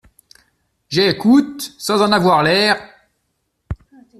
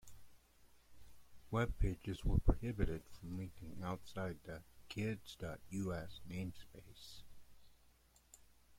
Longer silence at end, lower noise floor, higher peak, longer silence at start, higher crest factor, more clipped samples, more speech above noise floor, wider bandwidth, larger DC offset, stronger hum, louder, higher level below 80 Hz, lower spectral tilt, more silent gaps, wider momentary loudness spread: first, 0.45 s vs 0 s; about the same, -70 dBFS vs -69 dBFS; first, -2 dBFS vs -18 dBFS; first, 0.9 s vs 0.05 s; second, 16 dB vs 24 dB; neither; first, 55 dB vs 29 dB; second, 13.5 kHz vs 16.5 kHz; neither; neither; first, -15 LUFS vs -43 LUFS; about the same, -44 dBFS vs -48 dBFS; second, -4.5 dB/octave vs -7 dB/octave; neither; about the same, 19 LU vs 20 LU